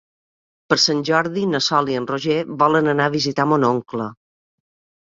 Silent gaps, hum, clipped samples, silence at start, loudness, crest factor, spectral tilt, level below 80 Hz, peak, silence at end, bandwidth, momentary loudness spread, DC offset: none; none; under 0.1%; 0.7 s; -19 LUFS; 18 dB; -4.5 dB/octave; -62 dBFS; -2 dBFS; 0.9 s; 7.8 kHz; 7 LU; under 0.1%